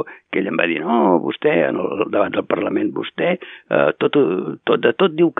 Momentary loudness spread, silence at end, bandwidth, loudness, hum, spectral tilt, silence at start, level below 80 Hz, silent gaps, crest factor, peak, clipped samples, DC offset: 6 LU; 0.05 s; 4 kHz; -19 LUFS; none; -10 dB/octave; 0 s; -70 dBFS; none; 18 dB; 0 dBFS; under 0.1%; under 0.1%